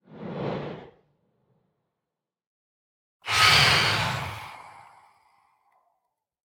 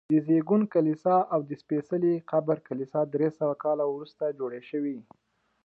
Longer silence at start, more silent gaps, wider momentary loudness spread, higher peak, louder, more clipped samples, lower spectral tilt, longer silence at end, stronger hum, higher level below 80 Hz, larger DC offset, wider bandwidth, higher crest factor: about the same, 0.1 s vs 0.1 s; first, 2.47-3.20 s vs none; first, 23 LU vs 9 LU; first, -6 dBFS vs -12 dBFS; first, -21 LUFS vs -28 LUFS; neither; second, -2.5 dB/octave vs -10.5 dB/octave; first, 1.7 s vs 0.65 s; neither; first, -56 dBFS vs -78 dBFS; neither; first, 19.5 kHz vs 5.4 kHz; first, 24 dB vs 16 dB